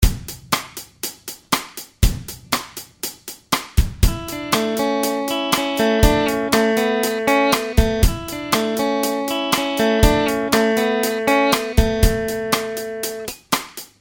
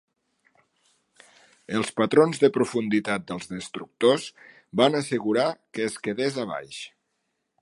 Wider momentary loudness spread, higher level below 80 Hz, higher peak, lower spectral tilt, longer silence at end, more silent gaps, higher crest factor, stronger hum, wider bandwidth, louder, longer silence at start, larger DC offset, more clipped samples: about the same, 12 LU vs 14 LU; first, -26 dBFS vs -68 dBFS; first, 0 dBFS vs -4 dBFS; about the same, -4.5 dB/octave vs -5 dB/octave; second, 0.15 s vs 0.75 s; neither; about the same, 18 dB vs 22 dB; neither; first, 18.5 kHz vs 11.5 kHz; first, -19 LUFS vs -25 LUFS; second, 0 s vs 1.7 s; neither; neither